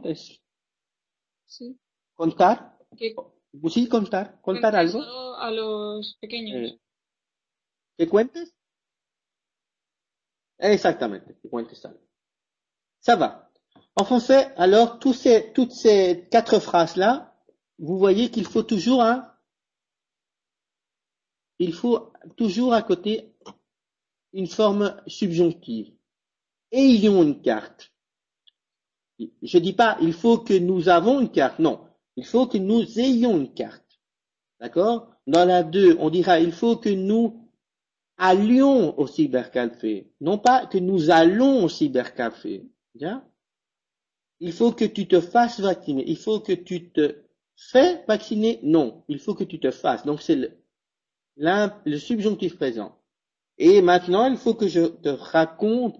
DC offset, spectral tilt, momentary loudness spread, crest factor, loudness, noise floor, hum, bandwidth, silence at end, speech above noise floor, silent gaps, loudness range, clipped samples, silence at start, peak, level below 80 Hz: under 0.1%; -6 dB/octave; 16 LU; 16 dB; -21 LUFS; -89 dBFS; none; 8 kHz; 0.1 s; 68 dB; none; 8 LU; under 0.1%; 0.05 s; -6 dBFS; -64 dBFS